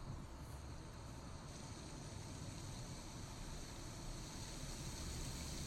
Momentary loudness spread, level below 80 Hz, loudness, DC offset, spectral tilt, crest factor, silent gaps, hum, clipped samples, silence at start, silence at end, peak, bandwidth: 6 LU; -54 dBFS; -51 LUFS; under 0.1%; -4 dB/octave; 14 dB; none; none; under 0.1%; 0 s; 0 s; -34 dBFS; 16 kHz